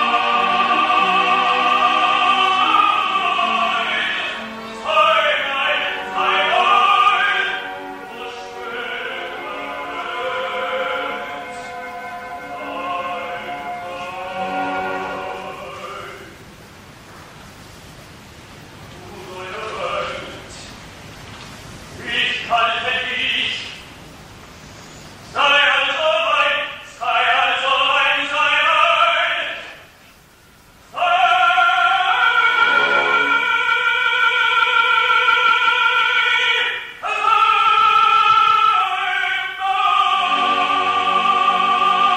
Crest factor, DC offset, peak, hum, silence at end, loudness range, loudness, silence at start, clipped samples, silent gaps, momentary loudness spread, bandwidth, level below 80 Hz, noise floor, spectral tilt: 16 dB; under 0.1%; -2 dBFS; none; 0 s; 15 LU; -16 LUFS; 0 s; under 0.1%; none; 17 LU; 16 kHz; -54 dBFS; -48 dBFS; -2 dB/octave